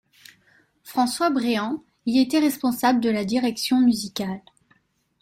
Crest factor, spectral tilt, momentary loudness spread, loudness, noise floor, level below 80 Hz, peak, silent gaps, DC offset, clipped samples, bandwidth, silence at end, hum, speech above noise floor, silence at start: 16 dB; -4.5 dB/octave; 10 LU; -22 LUFS; -64 dBFS; -64 dBFS; -8 dBFS; none; under 0.1%; under 0.1%; 16.5 kHz; 0.85 s; none; 42 dB; 0.85 s